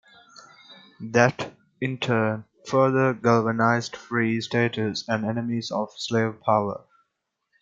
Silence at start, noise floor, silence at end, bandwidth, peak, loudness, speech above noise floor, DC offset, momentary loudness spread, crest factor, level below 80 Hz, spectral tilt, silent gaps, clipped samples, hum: 0.7 s; -79 dBFS; 0.85 s; 7.8 kHz; -2 dBFS; -24 LUFS; 56 dB; under 0.1%; 11 LU; 22 dB; -68 dBFS; -6 dB/octave; none; under 0.1%; none